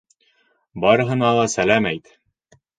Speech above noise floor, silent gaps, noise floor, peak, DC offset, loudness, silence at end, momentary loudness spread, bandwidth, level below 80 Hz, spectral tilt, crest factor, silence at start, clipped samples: 45 dB; none; -63 dBFS; 0 dBFS; under 0.1%; -18 LUFS; 0.8 s; 11 LU; 9.4 kHz; -54 dBFS; -5 dB/octave; 20 dB; 0.75 s; under 0.1%